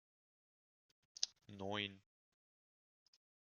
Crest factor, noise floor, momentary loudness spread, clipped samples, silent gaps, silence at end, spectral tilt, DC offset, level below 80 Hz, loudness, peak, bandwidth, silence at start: 38 dB; under -90 dBFS; 8 LU; under 0.1%; none; 1.6 s; -2 dB/octave; under 0.1%; under -90 dBFS; -45 LUFS; -16 dBFS; 10.5 kHz; 1.2 s